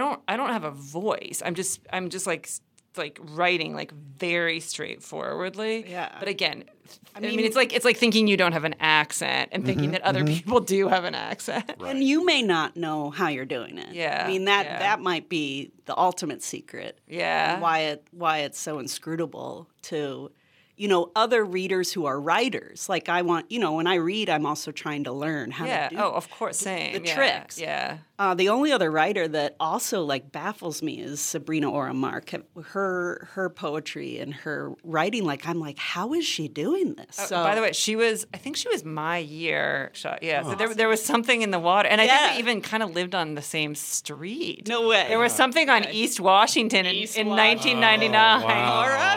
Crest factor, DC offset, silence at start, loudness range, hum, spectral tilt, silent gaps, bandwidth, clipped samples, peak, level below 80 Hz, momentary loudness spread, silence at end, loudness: 22 dB; under 0.1%; 0 s; 8 LU; none; -3 dB/octave; none; 18 kHz; under 0.1%; -2 dBFS; -74 dBFS; 13 LU; 0 s; -24 LUFS